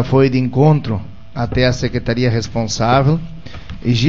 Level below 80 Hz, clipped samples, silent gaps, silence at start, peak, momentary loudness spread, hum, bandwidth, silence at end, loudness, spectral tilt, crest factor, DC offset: -34 dBFS; under 0.1%; none; 0 s; 0 dBFS; 14 LU; none; 7.6 kHz; 0 s; -16 LUFS; -6.5 dB/octave; 16 dB; 3%